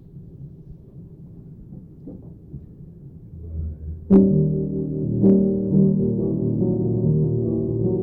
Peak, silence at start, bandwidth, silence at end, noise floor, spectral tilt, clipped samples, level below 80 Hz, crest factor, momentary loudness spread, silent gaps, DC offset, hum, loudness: -4 dBFS; 0.15 s; 1.6 kHz; 0 s; -42 dBFS; -14.5 dB/octave; under 0.1%; -40 dBFS; 18 dB; 25 LU; none; under 0.1%; none; -20 LUFS